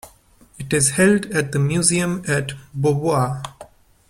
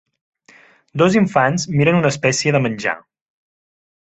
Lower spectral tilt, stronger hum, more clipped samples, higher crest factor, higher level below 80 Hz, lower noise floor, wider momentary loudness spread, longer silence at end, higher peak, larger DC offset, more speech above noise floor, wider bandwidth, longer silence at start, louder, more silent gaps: about the same, -4.5 dB/octave vs -5.5 dB/octave; neither; neither; about the same, 20 dB vs 18 dB; about the same, -50 dBFS vs -54 dBFS; about the same, -51 dBFS vs -50 dBFS; first, 14 LU vs 9 LU; second, 0.45 s vs 1.05 s; about the same, 0 dBFS vs -2 dBFS; neither; about the same, 32 dB vs 34 dB; first, 16 kHz vs 8.2 kHz; second, 0.05 s vs 0.95 s; second, -19 LUFS vs -16 LUFS; neither